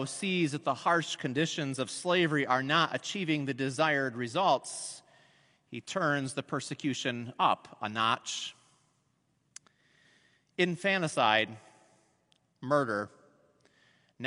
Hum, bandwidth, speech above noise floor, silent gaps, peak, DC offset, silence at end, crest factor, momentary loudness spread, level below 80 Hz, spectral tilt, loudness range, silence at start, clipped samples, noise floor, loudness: none; 11 kHz; 44 dB; none; -10 dBFS; under 0.1%; 0 s; 22 dB; 11 LU; -80 dBFS; -4 dB/octave; 5 LU; 0 s; under 0.1%; -74 dBFS; -30 LUFS